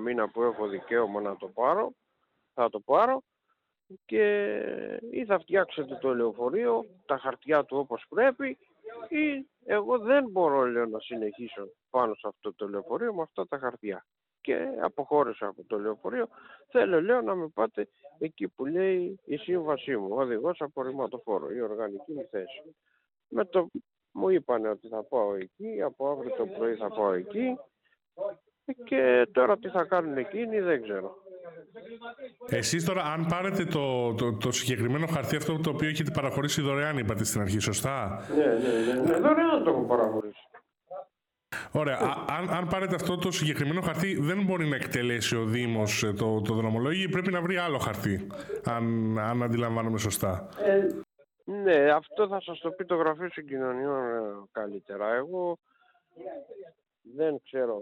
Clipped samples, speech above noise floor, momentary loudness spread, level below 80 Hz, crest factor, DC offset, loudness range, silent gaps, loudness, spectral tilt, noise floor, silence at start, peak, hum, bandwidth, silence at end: under 0.1%; 49 dB; 13 LU; -64 dBFS; 18 dB; under 0.1%; 5 LU; none; -29 LUFS; -5.5 dB/octave; -78 dBFS; 0 s; -10 dBFS; none; 18 kHz; 0 s